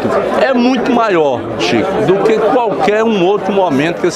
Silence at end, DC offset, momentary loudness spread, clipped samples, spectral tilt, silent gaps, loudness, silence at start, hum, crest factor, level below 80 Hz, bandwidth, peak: 0 s; under 0.1%; 3 LU; under 0.1%; -5.5 dB/octave; none; -12 LUFS; 0 s; none; 12 dB; -46 dBFS; 13 kHz; 0 dBFS